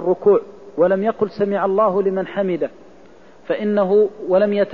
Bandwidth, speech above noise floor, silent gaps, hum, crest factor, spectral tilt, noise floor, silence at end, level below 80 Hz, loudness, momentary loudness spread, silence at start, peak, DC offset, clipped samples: 5.4 kHz; 29 dB; none; none; 14 dB; -9 dB/octave; -46 dBFS; 0 s; -62 dBFS; -18 LUFS; 7 LU; 0 s; -4 dBFS; 0.4%; under 0.1%